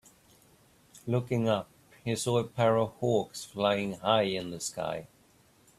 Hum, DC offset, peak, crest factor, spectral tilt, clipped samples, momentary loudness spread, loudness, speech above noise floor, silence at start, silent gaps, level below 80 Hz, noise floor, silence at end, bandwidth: none; under 0.1%; -12 dBFS; 20 dB; -5 dB/octave; under 0.1%; 11 LU; -30 LUFS; 33 dB; 0.95 s; none; -66 dBFS; -63 dBFS; 0.7 s; 14 kHz